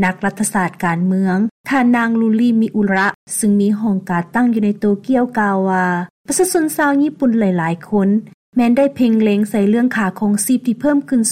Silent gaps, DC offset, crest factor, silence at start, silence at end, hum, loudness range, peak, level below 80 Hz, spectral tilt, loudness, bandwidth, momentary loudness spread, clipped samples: 1.51-1.64 s, 3.15-3.27 s, 6.10-6.25 s, 8.34-8.53 s; under 0.1%; 12 dB; 0 s; 0 s; none; 1 LU; -4 dBFS; -54 dBFS; -5.5 dB/octave; -16 LUFS; 16 kHz; 4 LU; under 0.1%